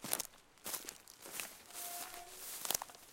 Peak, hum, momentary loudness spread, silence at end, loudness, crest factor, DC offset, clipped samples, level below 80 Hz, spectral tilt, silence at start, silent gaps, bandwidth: -12 dBFS; none; 10 LU; 0 s; -43 LUFS; 34 dB; under 0.1%; under 0.1%; -72 dBFS; 0 dB/octave; 0 s; none; 17 kHz